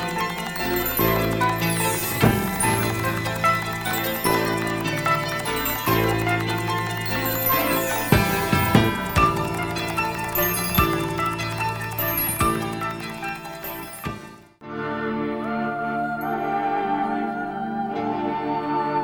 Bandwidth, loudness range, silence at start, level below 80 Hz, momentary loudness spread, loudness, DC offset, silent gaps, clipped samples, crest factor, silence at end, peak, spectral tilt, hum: over 20 kHz; 6 LU; 0 s; -40 dBFS; 8 LU; -23 LUFS; under 0.1%; none; under 0.1%; 22 dB; 0 s; 0 dBFS; -4.5 dB/octave; none